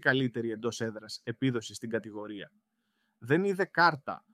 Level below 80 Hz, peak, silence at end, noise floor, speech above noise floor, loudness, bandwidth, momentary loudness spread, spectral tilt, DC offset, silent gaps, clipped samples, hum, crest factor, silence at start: -76 dBFS; -10 dBFS; 0.15 s; -78 dBFS; 47 dB; -31 LUFS; 15 kHz; 16 LU; -5.5 dB/octave; under 0.1%; none; under 0.1%; none; 22 dB; 0.05 s